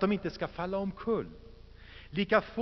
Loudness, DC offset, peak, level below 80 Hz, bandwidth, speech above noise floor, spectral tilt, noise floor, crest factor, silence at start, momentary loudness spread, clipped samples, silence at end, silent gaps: -33 LUFS; under 0.1%; -10 dBFS; -54 dBFS; 6.2 kHz; 19 dB; -4.5 dB/octave; -51 dBFS; 22 dB; 0 s; 23 LU; under 0.1%; 0 s; none